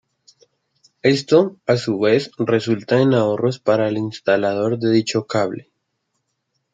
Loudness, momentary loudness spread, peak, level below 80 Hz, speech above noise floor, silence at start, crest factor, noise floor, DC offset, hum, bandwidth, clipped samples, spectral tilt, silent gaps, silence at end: -18 LUFS; 6 LU; -2 dBFS; -64 dBFS; 55 dB; 1.05 s; 18 dB; -73 dBFS; under 0.1%; none; 9.2 kHz; under 0.1%; -6 dB/octave; none; 1.15 s